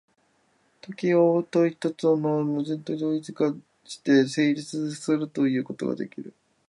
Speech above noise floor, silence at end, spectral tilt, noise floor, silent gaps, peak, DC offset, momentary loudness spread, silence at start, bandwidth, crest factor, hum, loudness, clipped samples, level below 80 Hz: 42 dB; 0.4 s; -6.5 dB/octave; -67 dBFS; none; -8 dBFS; under 0.1%; 13 LU; 0.9 s; 11.5 kHz; 18 dB; none; -25 LUFS; under 0.1%; -76 dBFS